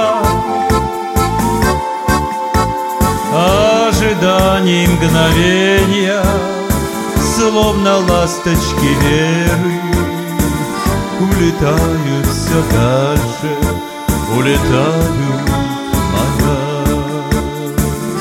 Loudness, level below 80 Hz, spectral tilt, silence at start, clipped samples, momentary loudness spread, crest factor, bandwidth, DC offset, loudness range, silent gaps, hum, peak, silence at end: -13 LUFS; -24 dBFS; -5 dB/octave; 0 s; under 0.1%; 6 LU; 12 dB; 17 kHz; under 0.1%; 3 LU; none; none; 0 dBFS; 0 s